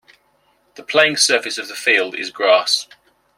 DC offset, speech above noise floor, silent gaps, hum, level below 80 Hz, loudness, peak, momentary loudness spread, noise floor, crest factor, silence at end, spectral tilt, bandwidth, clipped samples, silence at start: under 0.1%; 43 dB; none; none; -70 dBFS; -16 LUFS; -2 dBFS; 7 LU; -60 dBFS; 18 dB; 0.55 s; -0.5 dB/octave; 16 kHz; under 0.1%; 0.8 s